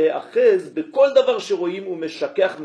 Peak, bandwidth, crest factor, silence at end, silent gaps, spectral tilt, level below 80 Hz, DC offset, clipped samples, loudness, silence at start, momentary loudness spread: -4 dBFS; 11 kHz; 16 dB; 0 s; none; -4.5 dB/octave; -72 dBFS; under 0.1%; under 0.1%; -20 LUFS; 0 s; 10 LU